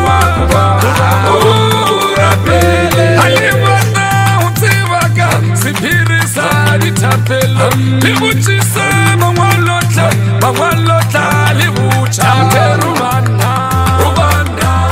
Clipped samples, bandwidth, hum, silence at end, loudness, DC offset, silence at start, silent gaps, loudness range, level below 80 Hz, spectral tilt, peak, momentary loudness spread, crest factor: under 0.1%; 16.5 kHz; none; 0 s; -10 LUFS; 0.3%; 0 s; none; 2 LU; -28 dBFS; -5 dB/octave; 0 dBFS; 3 LU; 10 dB